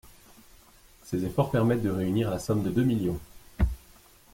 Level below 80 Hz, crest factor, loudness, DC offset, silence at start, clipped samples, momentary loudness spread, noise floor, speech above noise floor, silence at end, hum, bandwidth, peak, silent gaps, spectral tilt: -40 dBFS; 18 dB; -28 LUFS; under 0.1%; 0.05 s; under 0.1%; 10 LU; -56 dBFS; 29 dB; 0.55 s; none; 16.5 kHz; -12 dBFS; none; -7.5 dB/octave